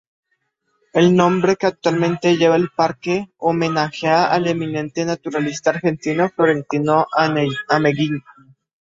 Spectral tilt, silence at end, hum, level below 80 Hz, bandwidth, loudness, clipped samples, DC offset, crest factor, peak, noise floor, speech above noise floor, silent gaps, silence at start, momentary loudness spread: -6 dB/octave; 0.6 s; none; -58 dBFS; 7.8 kHz; -18 LUFS; under 0.1%; under 0.1%; 18 dB; 0 dBFS; -70 dBFS; 52 dB; none; 0.95 s; 8 LU